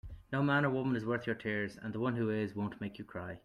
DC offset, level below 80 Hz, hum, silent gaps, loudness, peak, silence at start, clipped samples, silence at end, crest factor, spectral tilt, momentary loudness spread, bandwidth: under 0.1%; -60 dBFS; none; none; -35 LUFS; -18 dBFS; 0.05 s; under 0.1%; 0.05 s; 16 dB; -8 dB/octave; 12 LU; 11.5 kHz